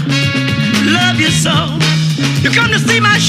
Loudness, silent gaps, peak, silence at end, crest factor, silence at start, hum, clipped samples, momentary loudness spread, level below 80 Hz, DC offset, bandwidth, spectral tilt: -11 LUFS; none; 0 dBFS; 0 s; 12 dB; 0 s; none; under 0.1%; 3 LU; -42 dBFS; under 0.1%; 15.5 kHz; -4 dB/octave